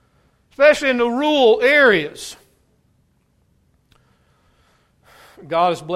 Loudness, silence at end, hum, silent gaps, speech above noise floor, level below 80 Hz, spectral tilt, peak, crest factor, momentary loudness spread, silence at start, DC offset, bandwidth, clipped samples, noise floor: -15 LUFS; 0 s; none; none; 46 dB; -56 dBFS; -4 dB/octave; 0 dBFS; 20 dB; 16 LU; 0.6 s; under 0.1%; 14 kHz; under 0.1%; -62 dBFS